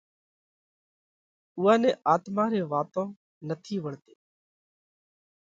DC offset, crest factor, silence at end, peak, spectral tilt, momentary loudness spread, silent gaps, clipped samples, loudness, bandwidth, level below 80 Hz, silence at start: under 0.1%; 22 dB; 1.55 s; -8 dBFS; -7 dB/octave; 18 LU; 3.17-3.41 s; under 0.1%; -27 LUFS; 7.8 kHz; -78 dBFS; 1.55 s